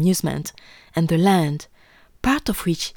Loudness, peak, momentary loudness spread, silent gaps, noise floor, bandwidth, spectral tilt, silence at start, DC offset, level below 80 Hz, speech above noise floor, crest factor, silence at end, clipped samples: -21 LUFS; -4 dBFS; 13 LU; none; -52 dBFS; over 20 kHz; -5.5 dB/octave; 0 s; under 0.1%; -44 dBFS; 31 dB; 18 dB; 0.05 s; under 0.1%